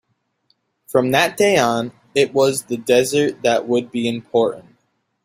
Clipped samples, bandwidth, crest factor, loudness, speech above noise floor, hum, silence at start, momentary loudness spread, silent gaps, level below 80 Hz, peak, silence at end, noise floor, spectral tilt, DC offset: under 0.1%; 16 kHz; 18 dB; -18 LUFS; 49 dB; none; 0.9 s; 8 LU; none; -60 dBFS; 0 dBFS; 0.65 s; -67 dBFS; -4 dB/octave; under 0.1%